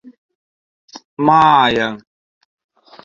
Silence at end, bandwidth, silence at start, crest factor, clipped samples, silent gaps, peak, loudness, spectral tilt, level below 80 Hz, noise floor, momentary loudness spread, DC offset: 1.05 s; 7.6 kHz; 0.95 s; 18 dB; under 0.1%; 1.05-1.17 s; 0 dBFS; -13 LUFS; -5.5 dB/octave; -56 dBFS; under -90 dBFS; 23 LU; under 0.1%